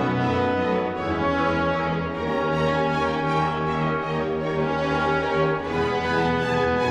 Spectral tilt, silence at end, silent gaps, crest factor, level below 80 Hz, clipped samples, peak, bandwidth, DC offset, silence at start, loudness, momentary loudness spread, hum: -7 dB/octave; 0 s; none; 14 dB; -44 dBFS; under 0.1%; -10 dBFS; 9.6 kHz; under 0.1%; 0 s; -23 LUFS; 3 LU; none